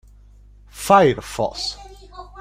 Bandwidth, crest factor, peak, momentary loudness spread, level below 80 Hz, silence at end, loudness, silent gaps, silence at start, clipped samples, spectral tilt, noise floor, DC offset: 16 kHz; 20 dB; -2 dBFS; 26 LU; -44 dBFS; 0 s; -18 LUFS; none; 0.75 s; under 0.1%; -4.5 dB/octave; -47 dBFS; under 0.1%